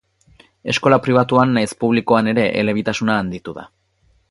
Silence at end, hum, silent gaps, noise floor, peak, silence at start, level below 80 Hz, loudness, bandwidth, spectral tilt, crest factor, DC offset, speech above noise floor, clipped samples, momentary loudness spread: 0.65 s; none; none; -60 dBFS; 0 dBFS; 0.65 s; -52 dBFS; -17 LUFS; 11.5 kHz; -6 dB/octave; 18 dB; under 0.1%; 43 dB; under 0.1%; 15 LU